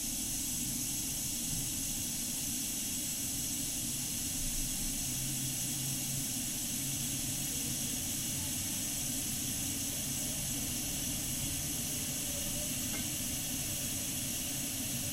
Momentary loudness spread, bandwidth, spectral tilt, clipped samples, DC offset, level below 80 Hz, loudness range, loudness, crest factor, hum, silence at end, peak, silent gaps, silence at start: 1 LU; 16 kHz; -2 dB/octave; under 0.1%; under 0.1%; -50 dBFS; 0 LU; -34 LUFS; 14 dB; none; 0 s; -22 dBFS; none; 0 s